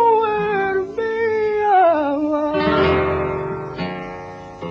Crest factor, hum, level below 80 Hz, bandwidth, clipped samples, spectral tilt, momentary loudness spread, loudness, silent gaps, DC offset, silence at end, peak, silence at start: 14 dB; none; -44 dBFS; 7 kHz; under 0.1%; -7.5 dB/octave; 14 LU; -19 LUFS; none; under 0.1%; 0 s; -6 dBFS; 0 s